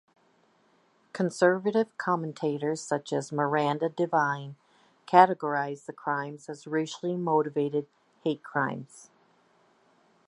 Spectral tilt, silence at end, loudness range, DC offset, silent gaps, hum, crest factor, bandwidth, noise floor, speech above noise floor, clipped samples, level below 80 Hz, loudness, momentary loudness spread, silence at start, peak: -6 dB/octave; 1.3 s; 5 LU; under 0.1%; none; none; 26 dB; 11.5 kHz; -66 dBFS; 38 dB; under 0.1%; -82 dBFS; -28 LUFS; 12 LU; 1.15 s; -4 dBFS